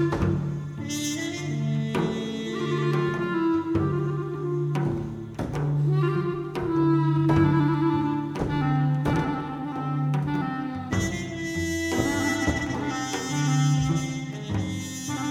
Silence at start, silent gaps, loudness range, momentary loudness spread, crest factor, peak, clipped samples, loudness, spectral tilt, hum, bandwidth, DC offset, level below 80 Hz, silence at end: 0 s; none; 4 LU; 9 LU; 18 dB; -8 dBFS; under 0.1%; -26 LUFS; -6 dB/octave; none; 14.5 kHz; under 0.1%; -46 dBFS; 0 s